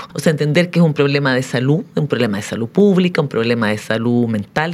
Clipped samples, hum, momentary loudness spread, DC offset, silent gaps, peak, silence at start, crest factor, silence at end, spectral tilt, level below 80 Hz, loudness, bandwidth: under 0.1%; none; 6 LU; under 0.1%; none; 0 dBFS; 0 s; 16 dB; 0 s; -6.5 dB/octave; -58 dBFS; -16 LUFS; 13.5 kHz